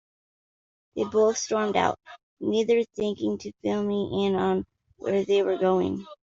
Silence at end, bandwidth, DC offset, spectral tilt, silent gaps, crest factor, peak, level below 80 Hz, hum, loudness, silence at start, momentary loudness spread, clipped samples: 0.1 s; 7.8 kHz; under 0.1%; -5 dB/octave; 2.23-2.37 s; 18 dB; -8 dBFS; -64 dBFS; none; -26 LUFS; 0.95 s; 9 LU; under 0.1%